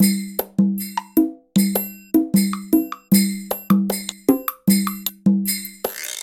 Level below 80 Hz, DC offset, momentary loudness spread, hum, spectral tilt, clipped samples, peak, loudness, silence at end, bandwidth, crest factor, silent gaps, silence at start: -58 dBFS; under 0.1%; 7 LU; none; -5 dB/octave; under 0.1%; -2 dBFS; -20 LUFS; 0 s; 17 kHz; 18 dB; none; 0 s